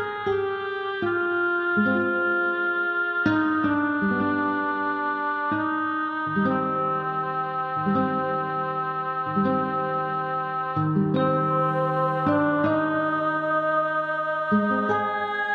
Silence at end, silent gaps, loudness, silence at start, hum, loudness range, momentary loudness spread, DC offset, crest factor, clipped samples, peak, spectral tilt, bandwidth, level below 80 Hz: 0 s; none; -24 LUFS; 0 s; none; 2 LU; 5 LU; under 0.1%; 16 dB; under 0.1%; -8 dBFS; -8.5 dB/octave; 6 kHz; -62 dBFS